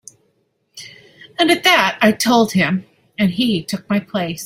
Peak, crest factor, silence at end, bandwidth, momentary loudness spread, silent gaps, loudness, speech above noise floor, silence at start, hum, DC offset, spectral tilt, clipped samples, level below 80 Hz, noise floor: 0 dBFS; 18 dB; 0 s; 16.5 kHz; 22 LU; none; -16 LUFS; 49 dB; 0.75 s; none; under 0.1%; -4 dB/octave; under 0.1%; -58 dBFS; -65 dBFS